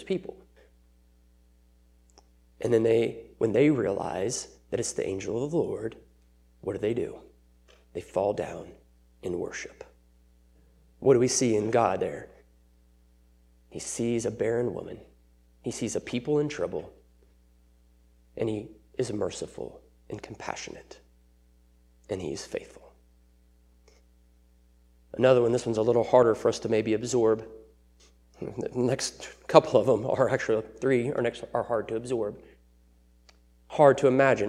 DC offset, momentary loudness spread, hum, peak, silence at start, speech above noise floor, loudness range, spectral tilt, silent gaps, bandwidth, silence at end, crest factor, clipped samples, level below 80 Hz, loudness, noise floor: under 0.1%; 20 LU; none; 0 dBFS; 0 s; 34 dB; 13 LU; -5 dB/octave; none; 12.5 kHz; 0 s; 28 dB; under 0.1%; -58 dBFS; -27 LUFS; -60 dBFS